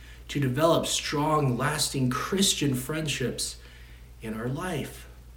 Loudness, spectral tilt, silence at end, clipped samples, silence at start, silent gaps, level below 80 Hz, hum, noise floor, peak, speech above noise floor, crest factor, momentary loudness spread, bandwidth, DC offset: -27 LUFS; -4 dB/octave; 0 s; under 0.1%; 0 s; none; -48 dBFS; none; -47 dBFS; -8 dBFS; 20 dB; 20 dB; 13 LU; 17.5 kHz; under 0.1%